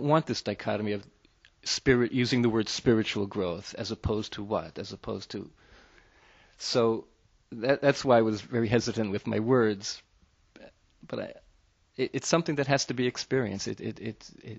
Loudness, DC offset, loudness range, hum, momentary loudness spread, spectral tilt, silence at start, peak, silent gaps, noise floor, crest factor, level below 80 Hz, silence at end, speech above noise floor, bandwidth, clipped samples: -29 LUFS; under 0.1%; 6 LU; none; 15 LU; -5 dB/octave; 0 s; -8 dBFS; none; -65 dBFS; 22 dB; -56 dBFS; 0 s; 37 dB; 8.2 kHz; under 0.1%